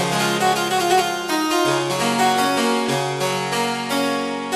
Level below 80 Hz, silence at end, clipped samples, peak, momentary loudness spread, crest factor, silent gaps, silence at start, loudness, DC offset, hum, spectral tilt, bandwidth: -60 dBFS; 0 s; under 0.1%; -6 dBFS; 4 LU; 14 dB; none; 0 s; -19 LUFS; under 0.1%; none; -3.5 dB/octave; 14 kHz